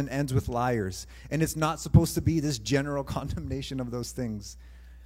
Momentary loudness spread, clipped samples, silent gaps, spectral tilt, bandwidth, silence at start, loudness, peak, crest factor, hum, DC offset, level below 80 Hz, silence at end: 12 LU; under 0.1%; none; -6 dB/octave; 16 kHz; 0 s; -29 LUFS; -6 dBFS; 22 dB; none; under 0.1%; -42 dBFS; 0 s